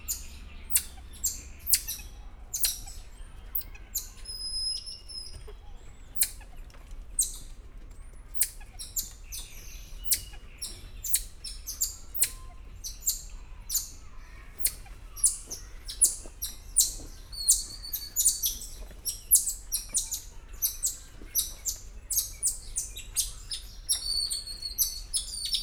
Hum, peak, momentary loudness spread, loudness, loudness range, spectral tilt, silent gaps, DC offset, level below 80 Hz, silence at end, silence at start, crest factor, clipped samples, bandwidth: none; -6 dBFS; 22 LU; -29 LUFS; 7 LU; 1 dB/octave; none; under 0.1%; -44 dBFS; 0 s; 0 s; 28 dB; under 0.1%; over 20 kHz